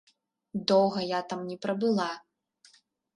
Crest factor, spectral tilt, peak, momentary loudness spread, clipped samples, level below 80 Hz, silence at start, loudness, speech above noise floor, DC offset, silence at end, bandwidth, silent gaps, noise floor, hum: 22 dB; -5.5 dB/octave; -10 dBFS; 12 LU; under 0.1%; -74 dBFS; 0.55 s; -29 LUFS; 35 dB; under 0.1%; 0.95 s; 10.5 kHz; none; -63 dBFS; none